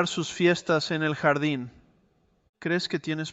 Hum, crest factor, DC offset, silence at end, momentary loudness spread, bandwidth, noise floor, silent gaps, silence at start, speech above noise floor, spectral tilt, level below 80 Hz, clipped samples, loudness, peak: none; 20 dB; under 0.1%; 0 s; 9 LU; 8.2 kHz; -66 dBFS; 2.49-2.54 s; 0 s; 40 dB; -5 dB/octave; -66 dBFS; under 0.1%; -26 LUFS; -8 dBFS